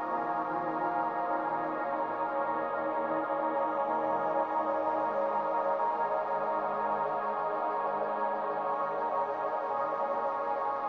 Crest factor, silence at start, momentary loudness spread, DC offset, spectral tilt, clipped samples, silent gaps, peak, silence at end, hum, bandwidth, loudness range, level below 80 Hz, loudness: 14 dB; 0 s; 2 LU; under 0.1%; -7.5 dB/octave; under 0.1%; none; -18 dBFS; 0 s; none; 6.4 kHz; 1 LU; -74 dBFS; -31 LUFS